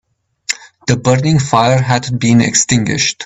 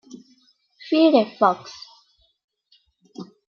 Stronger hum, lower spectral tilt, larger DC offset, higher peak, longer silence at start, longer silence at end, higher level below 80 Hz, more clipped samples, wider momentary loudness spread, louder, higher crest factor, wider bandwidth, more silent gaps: neither; second, -4.5 dB/octave vs -6 dB/octave; neither; first, 0 dBFS vs -4 dBFS; first, 0.5 s vs 0.15 s; second, 0 s vs 0.35 s; first, -44 dBFS vs -76 dBFS; neither; second, 11 LU vs 25 LU; first, -13 LUFS vs -19 LUFS; second, 14 dB vs 22 dB; first, 8.6 kHz vs 6.8 kHz; second, none vs 2.44-2.48 s